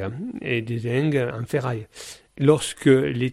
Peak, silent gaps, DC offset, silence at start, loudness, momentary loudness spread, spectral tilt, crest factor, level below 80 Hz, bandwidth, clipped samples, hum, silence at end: -4 dBFS; none; under 0.1%; 0 s; -23 LUFS; 14 LU; -6 dB/octave; 18 dB; -56 dBFS; 13.5 kHz; under 0.1%; none; 0 s